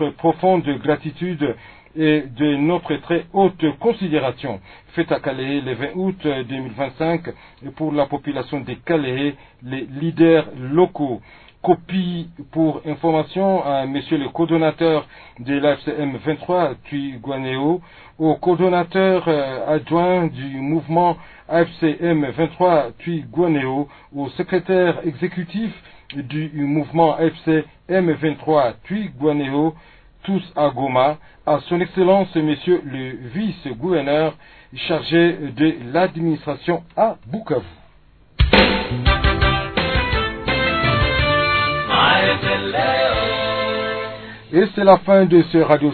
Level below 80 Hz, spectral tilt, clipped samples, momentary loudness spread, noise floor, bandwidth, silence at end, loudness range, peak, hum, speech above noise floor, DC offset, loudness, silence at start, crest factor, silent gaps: -36 dBFS; -9.5 dB/octave; under 0.1%; 11 LU; -50 dBFS; 4.6 kHz; 0 s; 5 LU; 0 dBFS; none; 31 dB; under 0.1%; -19 LUFS; 0 s; 18 dB; none